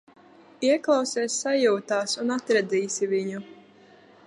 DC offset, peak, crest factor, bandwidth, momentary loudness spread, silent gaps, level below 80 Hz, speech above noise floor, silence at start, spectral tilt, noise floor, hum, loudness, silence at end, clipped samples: under 0.1%; -8 dBFS; 18 dB; 11.5 kHz; 5 LU; none; -80 dBFS; 29 dB; 0.6 s; -3 dB/octave; -53 dBFS; none; -25 LUFS; 0.75 s; under 0.1%